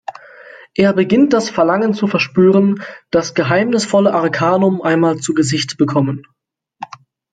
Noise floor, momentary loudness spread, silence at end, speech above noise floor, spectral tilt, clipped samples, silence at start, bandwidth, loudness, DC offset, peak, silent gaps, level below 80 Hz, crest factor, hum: -39 dBFS; 12 LU; 0.5 s; 26 dB; -5.5 dB/octave; under 0.1%; 0.1 s; 9.4 kHz; -14 LUFS; under 0.1%; 0 dBFS; none; -54 dBFS; 14 dB; none